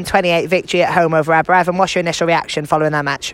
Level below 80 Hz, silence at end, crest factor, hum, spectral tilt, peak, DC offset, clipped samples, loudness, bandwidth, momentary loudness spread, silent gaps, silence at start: -48 dBFS; 0 s; 14 dB; none; -4.5 dB/octave; 0 dBFS; under 0.1%; under 0.1%; -15 LUFS; 16.5 kHz; 4 LU; none; 0 s